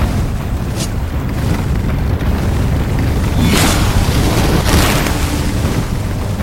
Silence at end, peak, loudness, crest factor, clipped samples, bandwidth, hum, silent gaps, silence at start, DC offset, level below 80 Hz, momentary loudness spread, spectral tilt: 0 s; 0 dBFS; -15 LUFS; 14 dB; under 0.1%; 16.5 kHz; none; none; 0 s; under 0.1%; -20 dBFS; 7 LU; -5 dB/octave